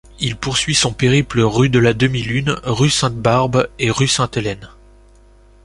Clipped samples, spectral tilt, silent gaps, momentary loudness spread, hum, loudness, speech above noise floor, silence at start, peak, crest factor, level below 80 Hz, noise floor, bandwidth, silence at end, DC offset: under 0.1%; -4.5 dB/octave; none; 7 LU; 50 Hz at -40 dBFS; -16 LUFS; 31 dB; 0.2 s; -2 dBFS; 16 dB; -40 dBFS; -46 dBFS; 11.5 kHz; 1 s; under 0.1%